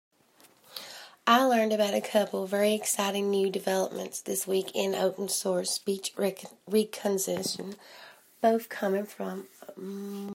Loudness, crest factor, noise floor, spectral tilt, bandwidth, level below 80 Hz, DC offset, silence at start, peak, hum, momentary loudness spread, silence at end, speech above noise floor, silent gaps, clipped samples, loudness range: -28 LUFS; 24 dB; -61 dBFS; -3.5 dB/octave; 16 kHz; -82 dBFS; under 0.1%; 0.7 s; -6 dBFS; none; 17 LU; 0 s; 32 dB; none; under 0.1%; 4 LU